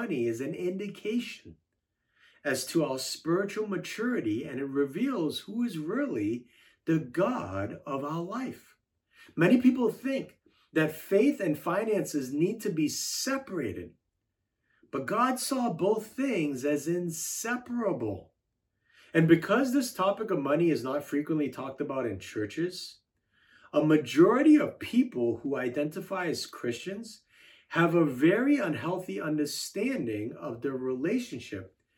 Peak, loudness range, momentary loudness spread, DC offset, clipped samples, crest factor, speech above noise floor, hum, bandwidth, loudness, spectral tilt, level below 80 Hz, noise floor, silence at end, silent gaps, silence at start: -8 dBFS; 6 LU; 12 LU; under 0.1%; under 0.1%; 22 dB; 53 dB; none; 18 kHz; -29 LUFS; -5.5 dB/octave; -74 dBFS; -82 dBFS; 0.3 s; none; 0 s